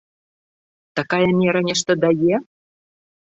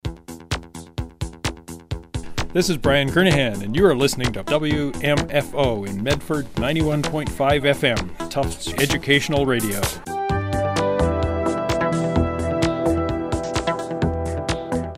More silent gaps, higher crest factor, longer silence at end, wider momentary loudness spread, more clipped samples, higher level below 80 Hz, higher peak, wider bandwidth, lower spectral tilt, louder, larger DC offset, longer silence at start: neither; about the same, 18 dB vs 20 dB; first, 0.8 s vs 0 s; second, 9 LU vs 12 LU; neither; second, -60 dBFS vs -36 dBFS; about the same, -4 dBFS vs -2 dBFS; second, 8 kHz vs 16 kHz; about the same, -5 dB/octave vs -5 dB/octave; about the same, -19 LUFS vs -21 LUFS; neither; first, 0.95 s vs 0.05 s